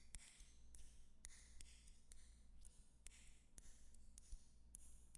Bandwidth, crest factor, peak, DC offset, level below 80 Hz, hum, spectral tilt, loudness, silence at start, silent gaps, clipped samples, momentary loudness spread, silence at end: 11.5 kHz; 26 dB; -36 dBFS; under 0.1%; -64 dBFS; none; -2 dB/octave; -66 LUFS; 0 s; none; under 0.1%; 6 LU; 0 s